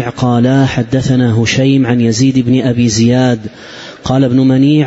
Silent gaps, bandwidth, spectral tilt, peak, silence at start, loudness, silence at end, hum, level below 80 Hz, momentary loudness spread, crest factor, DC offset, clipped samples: none; 8 kHz; -6 dB/octave; 0 dBFS; 0 s; -11 LUFS; 0 s; none; -40 dBFS; 8 LU; 10 dB; under 0.1%; under 0.1%